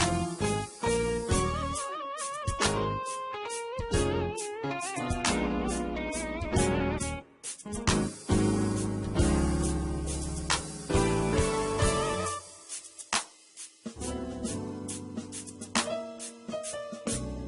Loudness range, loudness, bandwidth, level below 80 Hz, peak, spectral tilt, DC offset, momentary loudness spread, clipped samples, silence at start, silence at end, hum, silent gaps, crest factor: 6 LU; -31 LUFS; 11.5 kHz; -40 dBFS; -12 dBFS; -4.5 dB/octave; under 0.1%; 11 LU; under 0.1%; 0 s; 0 s; none; none; 18 dB